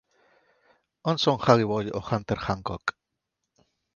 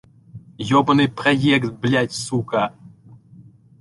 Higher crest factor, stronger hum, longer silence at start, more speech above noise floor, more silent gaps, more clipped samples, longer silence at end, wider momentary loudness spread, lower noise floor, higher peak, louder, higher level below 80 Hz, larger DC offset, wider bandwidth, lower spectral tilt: first, 26 dB vs 18 dB; neither; first, 1.05 s vs 0.35 s; first, 57 dB vs 28 dB; neither; neither; first, 1.05 s vs 0.9 s; first, 11 LU vs 8 LU; first, -82 dBFS vs -47 dBFS; about the same, -2 dBFS vs -4 dBFS; second, -26 LUFS vs -19 LUFS; about the same, -54 dBFS vs -54 dBFS; neither; second, 7.4 kHz vs 11.5 kHz; about the same, -6 dB/octave vs -5.5 dB/octave